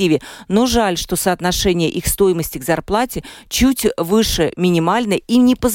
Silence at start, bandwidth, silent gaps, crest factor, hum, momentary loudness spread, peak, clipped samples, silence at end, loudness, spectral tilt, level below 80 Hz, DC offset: 0 s; 17 kHz; none; 14 dB; none; 6 LU; -2 dBFS; under 0.1%; 0 s; -16 LUFS; -4.5 dB/octave; -34 dBFS; under 0.1%